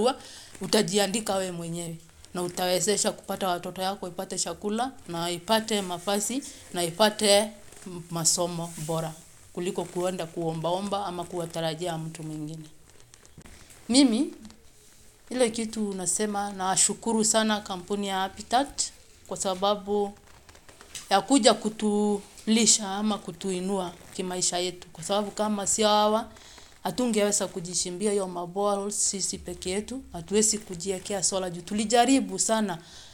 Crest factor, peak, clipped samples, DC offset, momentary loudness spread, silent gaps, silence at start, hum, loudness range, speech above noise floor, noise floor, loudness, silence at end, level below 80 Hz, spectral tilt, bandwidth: 24 dB; -2 dBFS; under 0.1%; under 0.1%; 14 LU; none; 0 s; none; 5 LU; 26 dB; -53 dBFS; -27 LUFS; 0 s; -58 dBFS; -3 dB/octave; 17 kHz